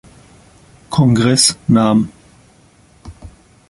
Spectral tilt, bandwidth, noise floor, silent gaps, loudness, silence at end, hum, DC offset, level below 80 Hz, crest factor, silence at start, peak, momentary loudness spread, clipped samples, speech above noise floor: -4.5 dB/octave; 11.5 kHz; -49 dBFS; none; -13 LUFS; 0.4 s; none; under 0.1%; -44 dBFS; 18 dB; 0.9 s; 0 dBFS; 8 LU; under 0.1%; 37 dB